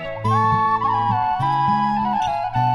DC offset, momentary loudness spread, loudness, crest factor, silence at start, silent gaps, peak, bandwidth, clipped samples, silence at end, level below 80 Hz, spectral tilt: under 0.1%; 3 LU; -19 LUFS; 12 dB; 0 s; none; -6 dBFS; 11 kHz; under 0.1%; 0 s; -46 dBFS; -7 dB/octave